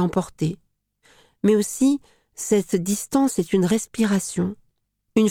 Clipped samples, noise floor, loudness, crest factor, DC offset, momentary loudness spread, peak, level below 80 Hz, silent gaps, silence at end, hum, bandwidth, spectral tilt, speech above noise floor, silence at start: under 0.1%; -70 dBFS; -22 LUFS; 16 dB; under 0.1%; 8 LU; -6 dBFS; -56 dBFS; none; 0 s; none; 17.5 kHz; -5.5 dB/octave; 49 dB; 0 s